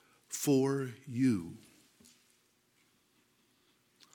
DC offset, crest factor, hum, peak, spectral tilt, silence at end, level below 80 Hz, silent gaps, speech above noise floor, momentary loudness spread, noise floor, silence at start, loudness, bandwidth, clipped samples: under 0.1%; 18 dB; 60 Hz at -60 dBFS; -20 dBFS; -6 dB/octave; 2.55 s; -76 dBFS; none; 40 dB; 16 LU; -72 dBFS; 0.3 s; -33 LUFS; 17 kHz; under 0.1%